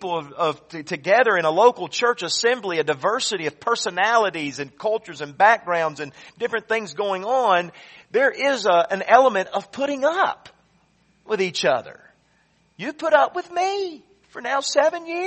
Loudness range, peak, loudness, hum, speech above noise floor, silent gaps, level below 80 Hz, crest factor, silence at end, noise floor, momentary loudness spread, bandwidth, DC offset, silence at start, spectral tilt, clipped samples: 4 LU; 0 dBFS; -21 LUFS; none; 41 dB; none; -70 dBFS; 22 dB; 0 s; -62 dBFS; 12 LU; 8.4 kHz; under 0.1%; 0 s; -3 dB/octave; under 0.1%